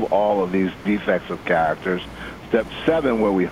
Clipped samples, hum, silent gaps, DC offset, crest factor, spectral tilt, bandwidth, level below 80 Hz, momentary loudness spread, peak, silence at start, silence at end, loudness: under 0.1%; none; none; under 0.1%; 16 dB; -7 dB/octave; 15.5 kHz; -46 dBFS; 7 LU; -4 dBFS; 0 s; 0 s; -21 LUFS